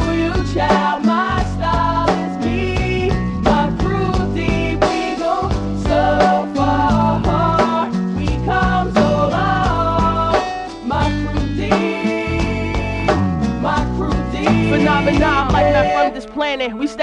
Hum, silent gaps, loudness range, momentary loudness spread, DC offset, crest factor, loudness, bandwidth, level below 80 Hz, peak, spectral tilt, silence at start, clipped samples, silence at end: none; none; 3 LU; 6 LU; under 0.1%; 16 dB; -17 LUFS; 10.5 kHz; -26 dBFS; 0 dBFS; -6.5 dB/octave; 0 s; under 0.1%; 0 s